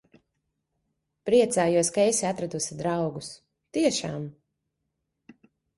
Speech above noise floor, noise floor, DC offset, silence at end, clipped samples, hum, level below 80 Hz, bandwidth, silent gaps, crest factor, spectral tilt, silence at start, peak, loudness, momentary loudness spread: 55 dB; -80 dBFS; under 0.1%; 1.45 s; under 0.1%; none; -66 dBFS; 11.5 kHz; none; 18 dB; -4 dB/octave; 1.25 s; -10 dBFS; -25 LUFS; 15 LU